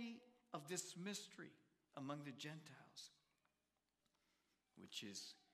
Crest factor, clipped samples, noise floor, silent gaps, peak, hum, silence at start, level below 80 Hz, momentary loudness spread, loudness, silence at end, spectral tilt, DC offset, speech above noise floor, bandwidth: 24 dB; under 0.1%; -90 dBFS; none; -32 dBFS; none; 0 s; under -90 dBFS; 13 LU; -54 LUFS; 0.1 s; -3 dB/octave; under 0.1%; 36 dB; 15 kHz